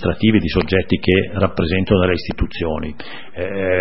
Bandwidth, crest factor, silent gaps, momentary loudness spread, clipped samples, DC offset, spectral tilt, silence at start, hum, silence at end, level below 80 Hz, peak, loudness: 5.8 kHz; 18 dB; none; 11 LU; under 0.1%; 3%; -10.5 dB/octave; 0 s; none; 0 s; -32 dBFS; 0 dBFS; -18 LUFS